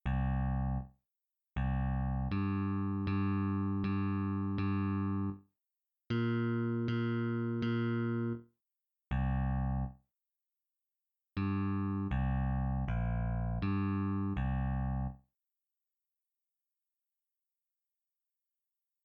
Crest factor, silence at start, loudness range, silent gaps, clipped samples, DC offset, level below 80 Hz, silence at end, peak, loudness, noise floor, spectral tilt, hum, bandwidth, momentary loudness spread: 12 dB; 0.05 s; 5 LU; none; under 0.1%; under 0.1%; -44 dBFS; 3.85 s; -22 dBFS; -35 LUFS; under -90 dBFS; -10.5 dB/octave; none; 5.4 kHz; 5 LU